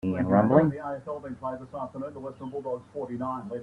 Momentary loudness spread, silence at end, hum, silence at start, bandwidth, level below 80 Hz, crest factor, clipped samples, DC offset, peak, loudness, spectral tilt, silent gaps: 16 LU; 0 s; none; 0.05 s; 10 kHz; -62 dBFS; 22 dB; under 0.1%; under 0.1%; -6 dBFS; -28 LUFS; -10 dB/octave; none